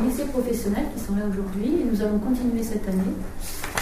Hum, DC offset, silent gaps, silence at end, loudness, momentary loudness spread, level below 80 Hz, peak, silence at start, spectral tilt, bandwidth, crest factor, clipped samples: none; under 0.1%; none; 0 s; -26 LUFS; 6 LU; -36 dBFS; -6 dBFS; 0 s; -6 dB/octave; 16 kHz; 20 dB; under 0.1%